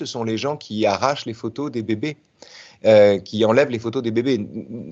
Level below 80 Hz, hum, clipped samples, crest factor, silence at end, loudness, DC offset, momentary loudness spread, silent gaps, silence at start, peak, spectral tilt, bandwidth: -64 dBFS; none; under 0.1%; 18 dB; 0 s; -20 LUFS; under 0.1%; 14 LU; none; 0 s; -2 dBFS; -6 dB/octave; 7.8 kHz